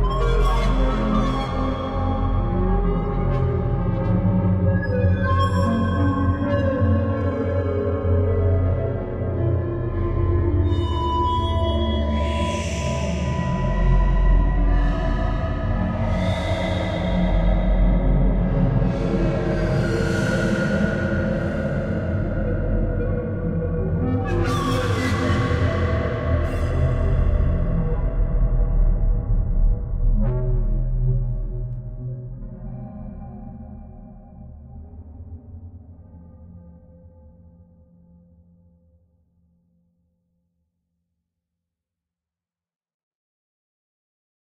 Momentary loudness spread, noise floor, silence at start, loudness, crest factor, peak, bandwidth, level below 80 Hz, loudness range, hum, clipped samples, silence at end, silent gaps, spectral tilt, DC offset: 12 LU; under -90 dBFS; 0 s; -22 LUFS; 14 dB; -6 dBFS; 9 kHz; -24 dBFS; 13 LU; none; under 0.1%; 7.4 s; none; -7.5 dB/octave; under 0.1%